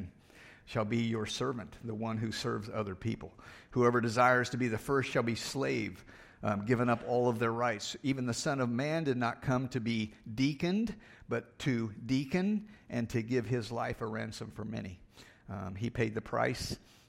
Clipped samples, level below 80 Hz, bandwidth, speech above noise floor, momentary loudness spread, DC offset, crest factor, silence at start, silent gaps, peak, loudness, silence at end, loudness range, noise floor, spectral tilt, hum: under 0.1%; -60 dBFS; 16 kHz; 24 dB; 12 LU; under 0.1%; 22 dB; 0 s; none; -12 dBFS; -34 LUFS; 0.3 s; 6 LU; -57 dBFS; -5.5 dB/octave; none